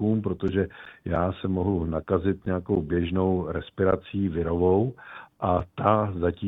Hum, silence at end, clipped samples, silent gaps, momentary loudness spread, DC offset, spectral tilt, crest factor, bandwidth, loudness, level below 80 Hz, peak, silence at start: none; 0 s; under 0.1%; none; 8 LU; under 0.1%; -10.5 dB/octave; 20 dB; 4 kHz; -26 LUFS; -46 dBFS; -6 dBFS; 0 s